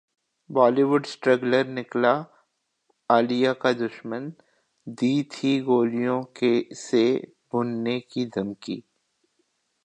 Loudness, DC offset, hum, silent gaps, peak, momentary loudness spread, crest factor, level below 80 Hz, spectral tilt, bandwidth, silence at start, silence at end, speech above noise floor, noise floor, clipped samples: -24 LUFS; under 0.1%; none; none; -4 dBFS; 13 LU; 20 dB; -74 dBFS; -6 dB/octave; 9.2 kHz; 0.5 s; 1.05 s; 49 dB; -72 dBFS; under 0.1%